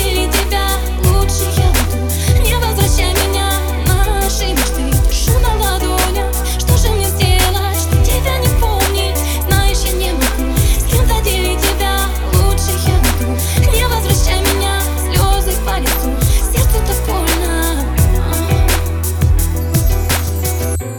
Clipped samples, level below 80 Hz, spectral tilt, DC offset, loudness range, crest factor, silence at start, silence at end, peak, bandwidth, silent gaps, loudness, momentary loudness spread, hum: under 0.1%; -16 dBFS; -4 dB/octave; under 0.1%; 1 LU; 12 dB; 0 s; 0 s; -2 dBFS; over 20 kHz; none; -14 LUFS; 3 LU; none